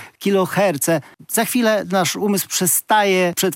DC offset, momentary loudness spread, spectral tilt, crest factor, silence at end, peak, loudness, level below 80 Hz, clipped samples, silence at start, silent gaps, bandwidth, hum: under 0.1%; 5 LU; -3.5 dB/octave; 14 dB; 0 s; -4 dBFS; -18 LUFS; -70 dBFS; under 0.1%; 0 s; none; 17 kHz; none